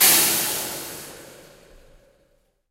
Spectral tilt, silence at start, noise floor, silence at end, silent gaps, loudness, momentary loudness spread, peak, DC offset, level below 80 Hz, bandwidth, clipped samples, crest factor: 0 dB/octave; 0 s; -64 dBFS; 1.35 s; none; -19 LUFS; 24 LU; -2 dBFS; under 0.1%; -56 dBFS; 16 kHz; under 0.1%; 22 dB